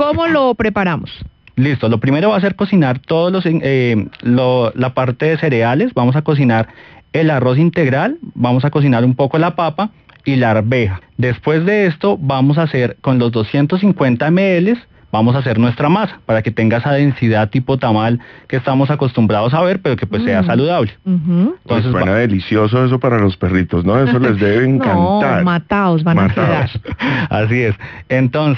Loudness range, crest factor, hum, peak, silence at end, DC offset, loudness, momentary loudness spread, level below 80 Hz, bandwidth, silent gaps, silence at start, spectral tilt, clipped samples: 2 LU; 12 dB; none; -2 dBFS; 0 s; under 0.1%; -14 LUFS; 5 LU; -44 dBFS; 6.2 kHz; none; 0 s; -9.5 dB/octave; under 0.1%